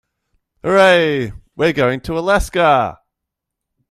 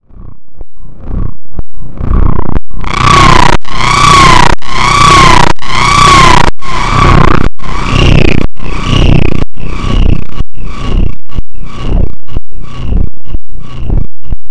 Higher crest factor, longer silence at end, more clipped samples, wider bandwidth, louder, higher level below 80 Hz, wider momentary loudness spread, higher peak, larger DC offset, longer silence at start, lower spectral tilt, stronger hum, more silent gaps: first, 16 dB vs 2 dB; first, 0.95 s vs 0 s; second, under 0.1% vs 20%; first, 14.5 kHz vs 11 kHz; second, -15 LUFS vs -7 LUFS; second, -36 dBFS vs -12 dBFS; second, 12 LU vs 21 LU; about the same, 0 dBFS vs 0 dBFS; neither; first, 0.65 s vs 0.2 s; about the same, -5 dB/octave vs -4.5 dB/octave; neither; neither